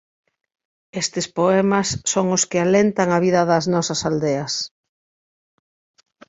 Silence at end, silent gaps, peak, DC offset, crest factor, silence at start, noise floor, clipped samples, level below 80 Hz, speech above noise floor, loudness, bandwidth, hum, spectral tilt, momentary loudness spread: 1.6 s; none; -2 dBFS; under 0.1%; 18 dB; 0.95 s; under -90 dBFS; under 0.1%; -56 dBFS; over 71 dB; -19 LUFS; 8.2 kHz; none; -4.5 dB/octave; 8 LU